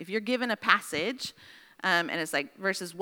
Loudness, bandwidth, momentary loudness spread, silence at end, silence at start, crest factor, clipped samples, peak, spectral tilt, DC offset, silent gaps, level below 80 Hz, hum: -29 LUFS; over 20 kHz; 8 LU; 0 s; 0 s; 26 dB; under 0.1%; -4 dBFS; -3 dB/octave; under 0.1%; none; -76 dBFS; none